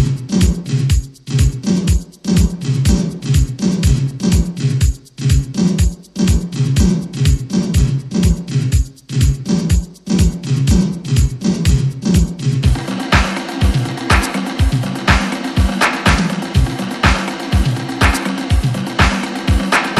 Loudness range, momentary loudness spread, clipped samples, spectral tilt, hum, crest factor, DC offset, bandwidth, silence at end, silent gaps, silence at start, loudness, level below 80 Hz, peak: 1 LU; 4 LU; under 0.1%; -5.5 dB/octave; none; 14 dB; under 0.1%; 13.5 kHz; 0 s; none; 0 s; -16 LUFS; -20 dBFS; 0 dBFS